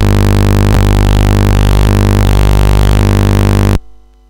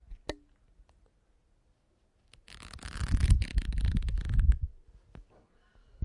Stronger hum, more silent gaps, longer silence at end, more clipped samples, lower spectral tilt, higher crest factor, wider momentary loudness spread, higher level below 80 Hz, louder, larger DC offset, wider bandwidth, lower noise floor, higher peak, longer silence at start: first, 50 Hz at -10 dBFS vs none; neither; first, 0.2 s vs 0 s; neither; about the same, -6.5 dB/octave vs -6 dB/octave; second, 6 dB vs 22 dB; second, 0 LU vs 21 LU; first, -12 dBFS vs -34 dBFS; first, -10 LUFS vs -32 LUFS; first, 3% vs under 0.1%; first, 17.5 kHz vs 11.5 kHz; second, -35 dBFS vs -70 dBFS; first, -2 dBFS vs -10 dBFS; about the same, 0 s vs 0.1 s